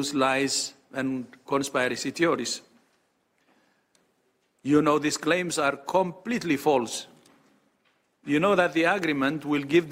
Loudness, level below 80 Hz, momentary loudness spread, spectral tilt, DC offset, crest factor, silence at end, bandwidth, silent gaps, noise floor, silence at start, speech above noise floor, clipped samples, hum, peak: -25 LUFS; -66 dBFS; 11 LU; -4 dB/octave; under 0.1%; 20 dB; 0 s; 16 kHz; none; -70 dBFS; 0 s; 45 dB; under 0.1%; none; -8 dBFS